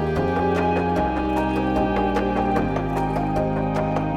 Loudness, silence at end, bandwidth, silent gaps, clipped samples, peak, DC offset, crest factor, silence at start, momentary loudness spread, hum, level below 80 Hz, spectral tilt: -22 LUFS; 0 s; 15 kHz; none; under 0.1%; -8 dBFS; under 0.1%; 14 dB; 0 s; 2 LU; none; -34 dBFS; -8 dB/octave